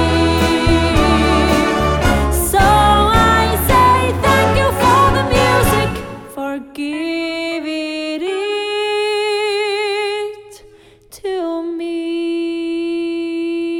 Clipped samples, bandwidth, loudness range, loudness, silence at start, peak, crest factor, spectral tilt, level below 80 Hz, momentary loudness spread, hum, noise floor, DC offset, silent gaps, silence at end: under 0.1%; 18 kHz; 9 LU; -15 LUFS; 0 s; 0 dBFS; 14 dB; -5 dB/octave; -26 dBFS; 11 LU; none; -44 dBFS; under 0.1%; none; 0 s